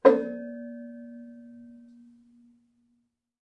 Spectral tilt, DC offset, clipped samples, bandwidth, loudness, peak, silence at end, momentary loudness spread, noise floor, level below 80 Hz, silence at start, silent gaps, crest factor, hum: -7 dB/octave; under 0.1%; under 0.1%; 6 kHz; -30 LUFS; -2 dBFS; 1.8 s; 23 LU; -74 dBFS; -80 dBFS; 0.05 s; none; 26 dB; none